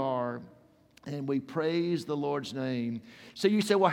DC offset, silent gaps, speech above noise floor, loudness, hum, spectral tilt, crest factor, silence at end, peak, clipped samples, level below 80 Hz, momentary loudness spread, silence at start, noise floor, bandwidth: under 0.1%; none; 31 dB; -31 LUFS; none; -6 dB/octave; 20 dB; 0 s; -10 dBFS; under 0.1%; -76 dBFS; 15 LU; 0 s; -60 dBFS; 17 kHz